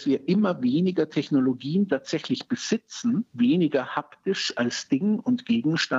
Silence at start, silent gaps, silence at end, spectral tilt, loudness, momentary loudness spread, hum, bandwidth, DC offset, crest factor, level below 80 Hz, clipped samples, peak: 0 s; none; 0 s; -5.5 dB/octave; -25 LUFS; 6 LU; none; 8 kHz; under 0.1%; 14 dB; -74 dBFS; under 0.1%; -10 dBFS